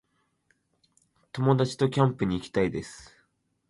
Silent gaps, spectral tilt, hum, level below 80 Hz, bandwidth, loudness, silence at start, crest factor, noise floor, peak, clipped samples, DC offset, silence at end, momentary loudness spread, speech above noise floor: none; -7 dB/octave; 50 Hz at -55 dBFS; -56 dBFS; 11.5 kHz; -26 LUFS; 1.35 s; 20 dB; -71 dBFS; -10 dBFS; under 0.1%; under 0.1%; 0.65 s; 17 LU; 46 dB